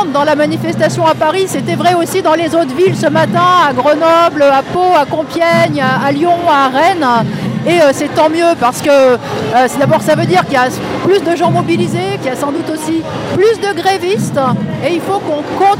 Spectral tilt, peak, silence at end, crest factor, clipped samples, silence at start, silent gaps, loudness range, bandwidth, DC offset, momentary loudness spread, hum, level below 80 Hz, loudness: -5.5 dB/octave; 0 dBFS; 0 s; 10 dB; under 0.1%; 0 s; none; 4 LU; 16.5 kHz; under 0.1%; 7 LU; none; -54 dBFS; -11 LUFS